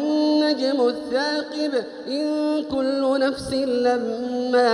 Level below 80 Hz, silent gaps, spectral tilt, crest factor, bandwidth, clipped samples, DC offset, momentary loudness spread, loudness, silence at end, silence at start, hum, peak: -58 dBFS; none; -4.5 dB/octave; 14 dB; 11.5 kHz; under 0.1%; under 0.1%; 6 LU; -22 LUFS; 0 s; 0 s; none; -6 dBFS